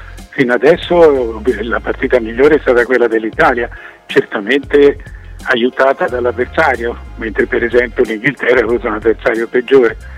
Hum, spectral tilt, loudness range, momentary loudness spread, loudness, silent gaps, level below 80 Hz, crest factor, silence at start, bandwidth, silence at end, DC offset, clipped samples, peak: none; -6 dB/octave; 2 LU; 8 LU; -13 LUFS; none; -34 dBFS; 12 dB; 0 s; 12 kHz; 0 s; under 0.1%; under 0.1%; 0 dBFS